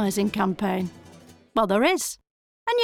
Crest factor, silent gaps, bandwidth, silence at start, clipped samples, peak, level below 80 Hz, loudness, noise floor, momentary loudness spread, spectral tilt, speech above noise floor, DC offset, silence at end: 16 dB; 2.30-2.66 s; 17.5 kHz; 0 s; under 0.1%; -8 dBFS; -58 dBFS; -25 LUFS; -50 dBFS; 13 LU; -4.5 dB/octave; 26 dB; under 0.1%; 0 s